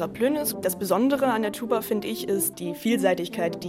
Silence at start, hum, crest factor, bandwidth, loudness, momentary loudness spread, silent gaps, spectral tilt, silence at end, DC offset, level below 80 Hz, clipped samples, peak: 0 s; none; 16 dB; 16.5 kHz; -25 LUFS; 5 LU; none; -4.5 dB/octave; 0 s; under 0.1%; -62 dBFS; under 0.1%; -8 dBFS